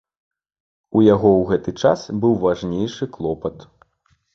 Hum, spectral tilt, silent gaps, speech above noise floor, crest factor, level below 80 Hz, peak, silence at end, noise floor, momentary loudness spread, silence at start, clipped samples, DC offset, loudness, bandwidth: none; -7.5 dB/octave; none; 46 dB; 18 dB; -48 dBFS; -2 dBFS; 0.75 s; -64 dBFS; 11 LU; 0.95 s; under 0.1%; under 0.1%; -19 LUFS; 7.4 kHz